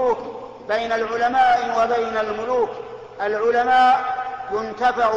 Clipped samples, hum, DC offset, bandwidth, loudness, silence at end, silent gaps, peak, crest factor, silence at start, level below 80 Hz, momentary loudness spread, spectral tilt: under 0.1%; none; under 0.1%; 7.8 kHz; -20 LUFS; 0 s; none; -8 dBFS; 12 dB; 0 s; -54 dBFS; 12 LU; -4 dB/octave